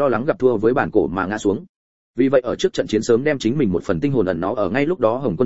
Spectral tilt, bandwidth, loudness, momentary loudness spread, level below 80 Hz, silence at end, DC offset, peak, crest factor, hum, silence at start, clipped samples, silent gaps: -6.5 dB/octave; 8 kHz; -19 LUFS; 4 LU; -48 dBFS; 0 s; 1%; -2 dBFS; 16 dB; none; 0 s; under 0.1%; 1.69-2.14 s